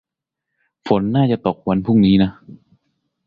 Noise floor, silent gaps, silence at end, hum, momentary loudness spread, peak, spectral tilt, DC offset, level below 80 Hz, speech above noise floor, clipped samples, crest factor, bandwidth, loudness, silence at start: -81 dBFS; none; 0.75 s; none; 7 LU; -2 dBFS; -10 dB/octave; under 0.1%; -46 dBFS; 65 dB; under 0.1%; 18 dB; 5 kHz; -17 LUFS; 0.85 s